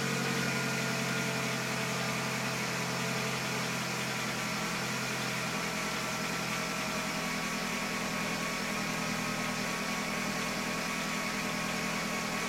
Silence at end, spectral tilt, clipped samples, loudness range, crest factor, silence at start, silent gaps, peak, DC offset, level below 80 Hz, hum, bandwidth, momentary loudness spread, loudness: 0 s; -3 dB/octave; under 0.1%; 1 LU; 14 dB; 0 s; none; -20 dBFS; under 0.1%; -60 dBFS; none; 16.5 kHz; 2 LU; -32 LUFS